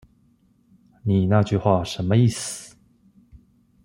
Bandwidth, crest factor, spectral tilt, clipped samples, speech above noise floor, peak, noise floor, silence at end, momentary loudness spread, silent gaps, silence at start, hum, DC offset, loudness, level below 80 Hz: 15.5 kHz; 20 dB; -6.5 dB/octave; under 0.1%; 41 dB; -4 dBFS; -60 dBFS; 0.5 s; 12 LU; none; 1.05 s; none; under 0.1%; -21 LUFS; -54 dBFS